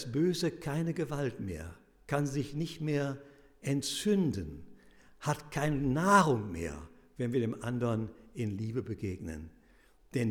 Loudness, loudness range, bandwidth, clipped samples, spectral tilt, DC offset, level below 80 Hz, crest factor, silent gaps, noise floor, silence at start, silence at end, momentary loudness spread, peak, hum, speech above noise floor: -33 LUFS; 6 LU; 18.5 kHz; under 0.1%; -6 dB/octave; under 0.1%; -56 dBFS; 22 dB; none; -63 dBFS; 0 s; 0 s; 14 LU; -10 dBFS; none; 30 dB